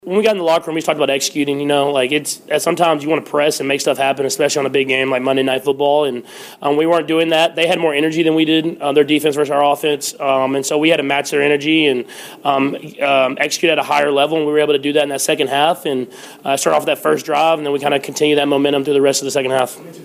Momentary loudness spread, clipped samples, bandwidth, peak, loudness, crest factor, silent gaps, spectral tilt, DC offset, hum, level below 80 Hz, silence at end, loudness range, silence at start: 5 LU; under 0.1%; 16 kHz; 0 dBFS; -16 LUFS; 14 dB; none; -3.5 dB/octave; under 0.1%; none; -66 dBFS; 0 s; 1 LU; 0.05 s